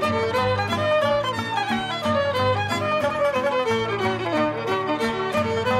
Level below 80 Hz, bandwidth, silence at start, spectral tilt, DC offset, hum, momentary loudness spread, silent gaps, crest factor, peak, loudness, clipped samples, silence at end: -54 dBFS; 15.5 kHz; 0 s; -5.5 dB/octave; under 0.1%; none; 3 LU; none; 12 dB; -10 dBFS; -23 LUFS; under 0.1%; 0 s